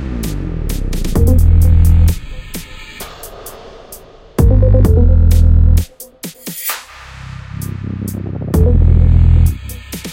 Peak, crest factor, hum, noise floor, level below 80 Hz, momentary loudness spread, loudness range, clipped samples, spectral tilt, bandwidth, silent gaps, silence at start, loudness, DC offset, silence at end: 0 dBFS; 12 dB; none; -36 dBFS; -14 dBFS; 20 LU; 4 LU; under 0.1%; -7 dB/octave; 17 kHz; none; 0 s; -13 LUFS; under 0.1%; 0 s